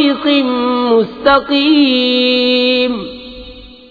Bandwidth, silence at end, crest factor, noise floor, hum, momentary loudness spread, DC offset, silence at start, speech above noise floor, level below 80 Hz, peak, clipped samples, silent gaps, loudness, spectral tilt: 4.9 kHz; 0.2 s; 12 dB; -34 dBFS; none; 16 LU; under 0.1%; 0 s; 22 dB; -44 dBFS; 0 dBFS; under 0.1%; none; -12 LUFS; -6 dB/octave